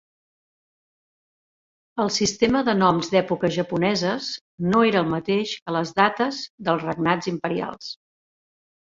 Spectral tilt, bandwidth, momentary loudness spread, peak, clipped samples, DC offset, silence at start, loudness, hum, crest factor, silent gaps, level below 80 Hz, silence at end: -5 dB/octave; 7.8 kHz; 10 LU; -4 dBFS; under 0.1%; under 0.1%; 1.95 s; -22 LUFS; none; 20 dB; 4.41-4.58 s, 5.62-5.66 s, 6.50-6.58 s; -58 dBFS; 0.9 s